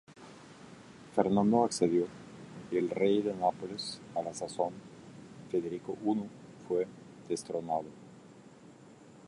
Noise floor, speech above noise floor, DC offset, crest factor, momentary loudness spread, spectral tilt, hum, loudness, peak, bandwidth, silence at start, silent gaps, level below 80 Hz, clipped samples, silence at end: -55 dBFS; 24 dB; under 0.1%; 22 dB; 24 LU; -5.5 dB/octave; none; -33 LUFS; -12 dBFS; 11.5 kHz; 0.1 s; none; -70 dBFS; under 0.1%; 0 s